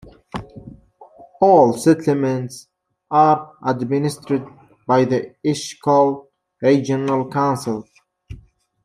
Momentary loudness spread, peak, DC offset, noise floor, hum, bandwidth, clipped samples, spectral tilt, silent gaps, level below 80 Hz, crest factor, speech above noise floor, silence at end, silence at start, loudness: 18 LU; -2 dBFS; under 0.1%; -48 dBFS; none; 15 kHz; under 0.1%; -6.5 dB/octave; none; -54 dBFS; 18 dB; 30 dB; 0.5 s; 0.05 s; -18 LUFS